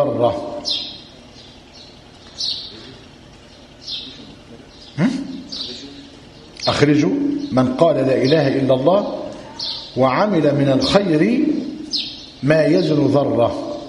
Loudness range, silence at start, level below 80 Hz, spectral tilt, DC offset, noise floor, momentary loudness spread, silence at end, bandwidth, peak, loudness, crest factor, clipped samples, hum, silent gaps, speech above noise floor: 13 LU; 0 s; -50 dBFS; -6 dB/octave; under 0.1%; -43 dBFS; 19 LU; 0 s; 11 kHz; 0 dBFS; -18 LUFS; 18 dB; under 0.1%; none; none; 27 dB